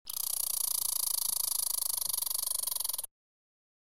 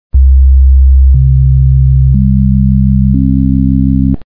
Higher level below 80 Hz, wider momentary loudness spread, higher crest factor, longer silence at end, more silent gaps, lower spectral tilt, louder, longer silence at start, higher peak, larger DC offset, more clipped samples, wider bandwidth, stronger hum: second, -72 dBFS vs -8 dBFS; about the same, 4 LU vs 3 LU; first, 20 dB vs 6 dB; first, 0.9 s vs 0 s; neither; second, 3 dB/octave vs -14 dB/octave; second, -30 LUFS vs -8 LUFS; about the same, 0.05 s vs 0.1 s; second, -14 dBFS vs 0 dBFS; second, 0.3% vs 5%; neither; first, 17 kHz vs 0.6 kHz; neither